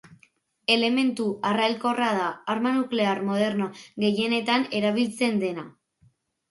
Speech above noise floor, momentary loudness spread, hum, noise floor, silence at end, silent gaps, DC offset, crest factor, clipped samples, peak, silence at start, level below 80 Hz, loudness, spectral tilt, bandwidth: 39 dB; 7 LU; none; -63 dBFS; 0.8 s; none; under 0.1%; 18 dB; under 0.1%; -6 dBFS; 0.1 s; -72 dBFS; -25 LUFS; -5 dB/octave; 11.5 kHz